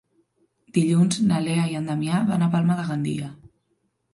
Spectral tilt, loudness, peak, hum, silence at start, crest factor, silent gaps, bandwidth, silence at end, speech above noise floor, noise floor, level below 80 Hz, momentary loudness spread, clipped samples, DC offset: -6.5 dB/octave; -23 LUFS; -8 dBFS; none; 0.75 s; 16 dB; none; 11.5 kHz; 0.65 s; 50 dB; -71 dBFS; -62 dBFS; 8 LU; under 0.1%; under 0.1%